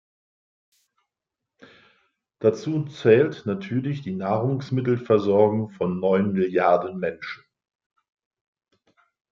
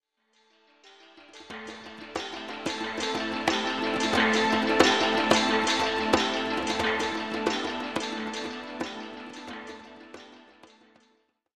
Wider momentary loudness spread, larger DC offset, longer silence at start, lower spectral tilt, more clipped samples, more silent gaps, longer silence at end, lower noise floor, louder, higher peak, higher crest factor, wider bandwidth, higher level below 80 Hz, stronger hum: second, 11 LU vs 19 LU; neither; first, 2.4 s vs 0.85 s; first, -8.5 dB/octave vs -3 dB/octave; neither; neither; first, 1.95 s vs 1.15 s; first, -86 dBFS vs -69 dBFS; first, -23 LUFS vs -26 LUFS; about the same, -4 dBFS vs -4 dBFS; about the same, 20 dB vs 24 dB; second, 7.2 kHz vs 15 kHz; second, -68 dBFS vs -58 dBFS; neither